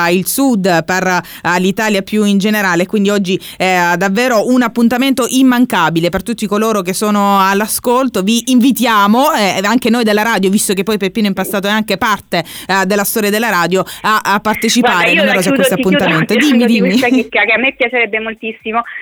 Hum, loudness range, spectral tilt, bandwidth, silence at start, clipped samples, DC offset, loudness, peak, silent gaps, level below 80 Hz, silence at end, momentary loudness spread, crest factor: none; 3 LU; -4 dB/octave; over 20 kHz; 0 s; under 0.1%; under 0.1%; -12 LUFS; -2 dBFS; none; -48 dBFS; 0 s; 5 LU; 10 dB